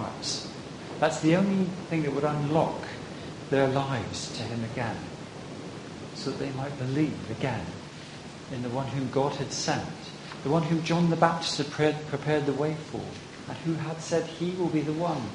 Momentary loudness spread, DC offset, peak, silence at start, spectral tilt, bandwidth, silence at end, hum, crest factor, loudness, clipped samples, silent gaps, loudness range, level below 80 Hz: 15 LU; under 0.1%; -4 dBFS; 0 s; -5.5 dB/octave; 10.5 kHz; 0 s; none; 24 dB; -29 LUFS; under 0.1%; none; 6 LU; -58 dBFS